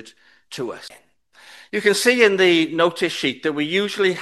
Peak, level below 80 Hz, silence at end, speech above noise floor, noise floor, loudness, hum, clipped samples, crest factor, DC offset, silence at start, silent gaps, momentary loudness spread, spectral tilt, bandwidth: 0 dBFS; -70 dBFS; 0 s; 29 dB; -48 dBFS; -18 LUFS; none; under 0.1%; 20 dB; under 0.1%; 0.05 s; none; 16 LU; -3.5 dB/octave; 12.5 kHz